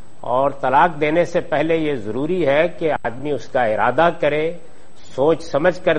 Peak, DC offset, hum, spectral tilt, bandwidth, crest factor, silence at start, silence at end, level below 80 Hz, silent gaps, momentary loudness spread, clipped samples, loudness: 0 dBFS; 4%; none; -6.5 dB/octave; 9.4 kHz; 18 dB; 0.25 s; 0 s; -50 dBFS; none; 8 LU; under 0.1%; -19 LUFS